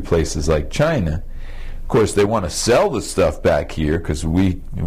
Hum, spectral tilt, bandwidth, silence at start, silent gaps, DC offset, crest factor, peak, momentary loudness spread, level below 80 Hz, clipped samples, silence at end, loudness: none; -5.5 dB/octave; 15.5 kHz; 0 s; none; under 0.1%; 12 dB; -6 dBFS; 11 LU; -28 dBFS; under 0.1%; 0 s; -19 LUFS